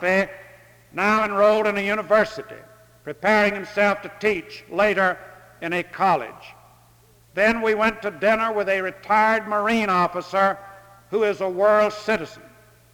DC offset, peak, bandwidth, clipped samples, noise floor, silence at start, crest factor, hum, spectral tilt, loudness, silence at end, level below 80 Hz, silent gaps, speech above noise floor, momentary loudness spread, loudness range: under 0.1%; -4 dBFS; 19.5 kHz; under 0.1%; -54 dBFS; 0 s; 18 dB; none; -5 dB/octave; -21 LUFS; 0.55 s; -56 dBFS; none; 33 dB; 13 LU; 3 LU